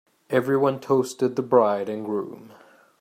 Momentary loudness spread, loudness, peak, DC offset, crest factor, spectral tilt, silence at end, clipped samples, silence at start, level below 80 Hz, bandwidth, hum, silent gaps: 10 LU; -23 LUFS; -4 dBFS; under 0.1%; 20 dB; -6.5 dB/octave; 0.5 s; under 0.1%; 0.3 s; -70 dBFS; 15.5 kHz; none; none